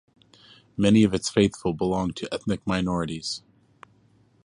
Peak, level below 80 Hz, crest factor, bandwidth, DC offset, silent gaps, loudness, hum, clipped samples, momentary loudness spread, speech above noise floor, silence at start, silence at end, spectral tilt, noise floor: -6 dBFS; -50 dBFS; 20 dB; 11 kHz; under 0.1%; none; -24 LUFS; none; under 0.1%; 12 LU; 37 dB; 0.8 s; 1.05 s; -5.5 dB/octave; -60 dBFS